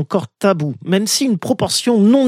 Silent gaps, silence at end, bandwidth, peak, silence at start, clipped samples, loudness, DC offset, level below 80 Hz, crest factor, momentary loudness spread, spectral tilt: none; 0 s; 16 kHz; -2 dBFS; 0 s; under 0.1%; -16 LUFS; under 0.1%; -58 dBFS; 14 dB; 6 LU; -4.5 dB/octave